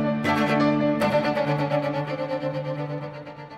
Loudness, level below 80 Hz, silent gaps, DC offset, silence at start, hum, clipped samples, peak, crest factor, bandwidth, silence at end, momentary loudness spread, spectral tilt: -24 LUFS; -58 dBFS; none; under 0.1%; 0 s; none; under 0.1%; -10 dBFS; 16 dB; 15.5 kHz; 0 s; 11 LU; -7 dB/octave